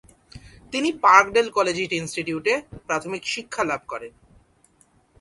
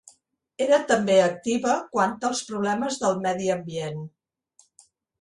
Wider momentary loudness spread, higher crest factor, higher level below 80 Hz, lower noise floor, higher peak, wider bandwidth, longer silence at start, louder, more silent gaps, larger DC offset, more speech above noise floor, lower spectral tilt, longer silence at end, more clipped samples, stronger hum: first, 15 LU vs 12 LU; first, 24 dB vs 18 dB; first, -56 dBFS vs -66 dBFS; about the same, -60 dBFS vs -63 dBFS; first, 0 dBFS vs -6 dBFS; about the same, 11.5 kHz vs 11.5 kHz; second, 0.35 s vs 0.6 s; about the same, -22 LUFS vs -24 LUFS; neither; neither; about the same, 38 dB vs 39 dB; about the same, -3.5 dB/octave vs -4.5 dB/octave; about the same, 1.1 s vs 1.15 s; neither; neither